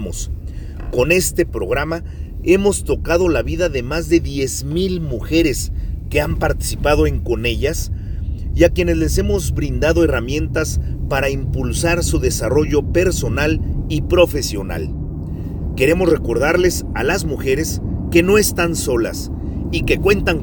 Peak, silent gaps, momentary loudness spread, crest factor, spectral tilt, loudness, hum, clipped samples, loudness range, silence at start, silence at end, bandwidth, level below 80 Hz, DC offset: 0 dBFS; none; 11 LU; 18 dB; -5 dB/octave; -18 LUFS; none; under 0.1%; 2 LU; 0 s; 0 s; over 20 kHz; -24 dBFS; under 0.1%